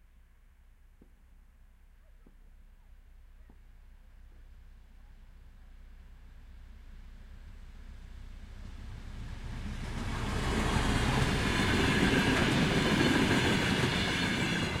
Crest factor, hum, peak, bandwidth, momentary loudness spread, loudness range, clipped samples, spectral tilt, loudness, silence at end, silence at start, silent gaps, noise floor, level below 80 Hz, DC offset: 18 dB; none; -14 dBFS; 16.5 kHz; 25 LU; 24 LU; under 0.1%; -5 dB/octave; -29 LUFS; 0 s; 2.55 s; none; -59 dBFS; -42 dBFS; under 0.1%